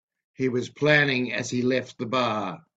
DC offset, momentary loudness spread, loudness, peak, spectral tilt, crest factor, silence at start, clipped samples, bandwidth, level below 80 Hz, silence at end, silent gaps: under 0.1%; 8 LU; -24 LUFS; -4 dBFS; -5 dB/octave; 22 dB; 0.4 s; under 0.1%; 8.4 kHz; -66 dBFS; 0.2 s; none